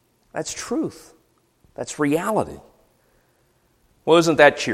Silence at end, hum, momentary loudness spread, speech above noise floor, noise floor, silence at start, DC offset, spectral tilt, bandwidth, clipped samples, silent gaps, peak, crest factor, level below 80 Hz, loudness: 0 s; none; 18 LU; 43 dB; -63 dBFS; 0.35 s; under 0.1%; -4 dB/octave; 15.5 kHz; under 0.1%; none; 0 dBFS; 22 dB; -56 dBFS; -20 LUFS